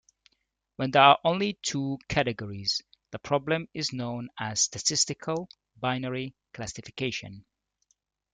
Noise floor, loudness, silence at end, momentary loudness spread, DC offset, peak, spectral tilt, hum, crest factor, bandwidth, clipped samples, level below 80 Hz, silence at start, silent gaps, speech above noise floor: -77 dBFS; -27 LUFS; 0.9 s; 17 LU; under 0.1%; -4 dBFS; -3 dB/octave; none; 26 dB; 10 kHz; under 0.1%; -60 dBFS; 0.8 s; none; 49 dB